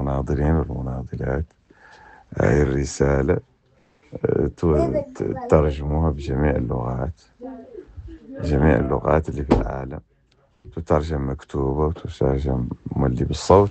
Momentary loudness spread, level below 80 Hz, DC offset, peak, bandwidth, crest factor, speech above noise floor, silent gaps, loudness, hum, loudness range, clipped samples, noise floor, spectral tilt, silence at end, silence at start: 18 LU; -30 dBFS; under 0.1%; 0 dBFS; 8.6 kHz; 22 dB; 40 dB; none; -22 LUFS; none; 2 LU; under 0.1%; -61 dBFS; -7.5 dB/octave; 0 s; 0 s